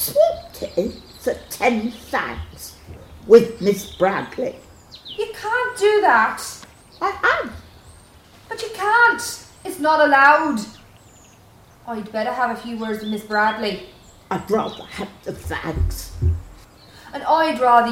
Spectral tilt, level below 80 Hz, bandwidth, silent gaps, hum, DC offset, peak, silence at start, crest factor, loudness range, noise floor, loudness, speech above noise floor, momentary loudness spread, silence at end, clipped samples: -4.5 dB/octave; -38 dBFS; 16.5 kHz; none; none; under 0.1%; 0 dBFS; 0 s; 20 dB; 7 LU; -49 dBFS; -20 LUFS; 29 dB; 19 LU; 0 s; under 0.1%